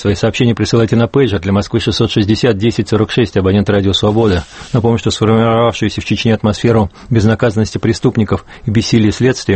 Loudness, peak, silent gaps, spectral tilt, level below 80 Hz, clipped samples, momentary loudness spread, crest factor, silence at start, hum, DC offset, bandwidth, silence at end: -13 LUFS; 0 dBFS; none; -6.5 dB/octave; -36 dBFS; under 0.1%; 4 LU; 12 dB; 0 s; none; under 0.1%; 8.8 kHz; 0 s